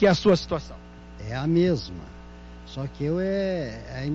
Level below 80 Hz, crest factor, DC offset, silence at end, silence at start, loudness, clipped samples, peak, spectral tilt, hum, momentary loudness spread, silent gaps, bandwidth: -44 dBFS; 16 dB; under 0.1%; 0 s; 0 s; -26 LUFS; under 0.1%; -10 dBFS; -7 dB/octave; 60 Hz at -40 dBFS; 23 LU; none; 7.8 kHz